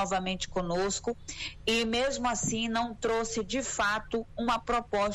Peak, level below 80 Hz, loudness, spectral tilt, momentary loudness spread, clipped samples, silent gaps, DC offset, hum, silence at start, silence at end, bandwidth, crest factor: -16 dBFS; -48 dBFS; -30 LUFS; -3 dB/octave; 5 LU; under 0.1%; none; under 0.1%; none; 0 s; 0 s; 15 kHz; 14 dB